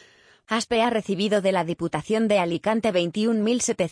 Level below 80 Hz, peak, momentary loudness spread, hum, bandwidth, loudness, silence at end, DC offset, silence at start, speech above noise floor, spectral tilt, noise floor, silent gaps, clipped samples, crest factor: -60 dBFS; -8 dBFS; 5 LU; none; 10.5 kHz; -23 LUFS; 0 s; under 0.1%; 0.5 s; 31 dB; -4.5 dB/octave; -54 dBFS; none; under 0.1%; 14 dB